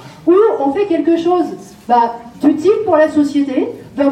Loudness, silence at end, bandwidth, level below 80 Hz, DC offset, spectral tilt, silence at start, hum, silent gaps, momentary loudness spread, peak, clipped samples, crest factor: -14 LUFS; 0 s; 10 kHz; -56 dBFS; under 0.1%; -6.5 dB/octave; 0 s; none; none; 8 LU; -2 dBFS; under 0.1%; 12 dB